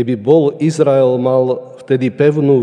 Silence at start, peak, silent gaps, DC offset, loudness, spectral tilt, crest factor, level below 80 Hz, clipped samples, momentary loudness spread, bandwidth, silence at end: 0 s; 0 dBFS; none; under 0.1%; -13 LUFS; -8 dB/octave; 12 dB; -66 dBFS; under 0.1%; 7 LU; 10 kHz; 0 s